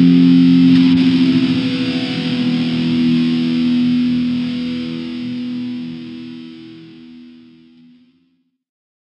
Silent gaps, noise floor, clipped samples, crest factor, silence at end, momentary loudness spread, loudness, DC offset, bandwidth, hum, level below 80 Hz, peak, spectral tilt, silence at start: none; -62 dBFS; under 0.1%; 14 dB; 1.8 s; 19 LU; -15 LUFS; under 0.1%; 6.8 kHz; none; -52 dBFS; -2 dBFS; -7.5 dB/octave; 0 s